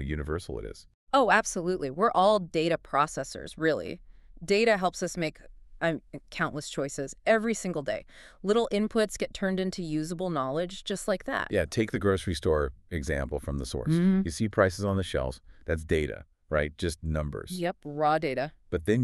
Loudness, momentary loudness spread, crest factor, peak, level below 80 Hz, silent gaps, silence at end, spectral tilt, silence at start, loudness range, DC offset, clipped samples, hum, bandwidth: -29 LUFS; 11 LU; 22 dB; -8 dBFS; -44 dBFS; 0.94-1.07 s; 0 s; -5.5 dB/octave; 0 s; 4 LU; under 0.1%; under 0.1%; none; 13 kHz